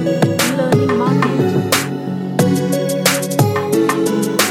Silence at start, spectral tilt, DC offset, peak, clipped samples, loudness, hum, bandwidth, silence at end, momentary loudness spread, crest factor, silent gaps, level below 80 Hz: 0 s; -5 dB/octave; under 0.1%; 0 dBFS; under 0.1%; -15 LUFS; none; 16.5 kHz; 0 s; 2 LU; 16 dB; none; -56 dBFS